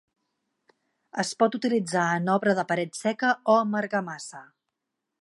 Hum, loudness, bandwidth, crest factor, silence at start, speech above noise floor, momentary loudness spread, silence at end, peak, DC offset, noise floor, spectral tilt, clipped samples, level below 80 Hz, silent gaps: none; -25 LUFS; 11.5 kHz; 20 dB; 1.15 s; 58 dB; 12 LU; 0.8 s; -6 dBFS; under 0.1%; -84 dBFS; -5 dB/octave; under 0.1%; -80 dBFS; none